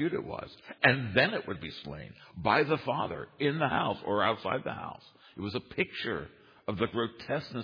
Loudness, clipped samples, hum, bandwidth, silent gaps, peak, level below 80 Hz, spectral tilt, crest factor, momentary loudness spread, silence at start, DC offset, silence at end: -31 LUFS; under 0.1%; none; 5.2 kHz; none; -8 dBFS; -62 dBFS; -7.5 dB/octave; 24 dB; 16 LU; 0 s; under 0.1%; 0 s